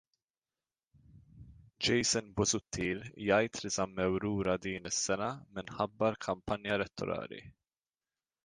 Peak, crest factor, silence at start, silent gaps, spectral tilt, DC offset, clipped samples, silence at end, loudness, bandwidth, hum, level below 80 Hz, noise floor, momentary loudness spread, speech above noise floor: -14 dBFS; 22 dB; 1.35 s; none; -3.5 dB/octave; under 0.1%; under 0.1%; 0.95 s; -34 LUFS; 10.5 kHz; none; -60 dBFS; under -90 dBFS; 8 LU; over 56 dB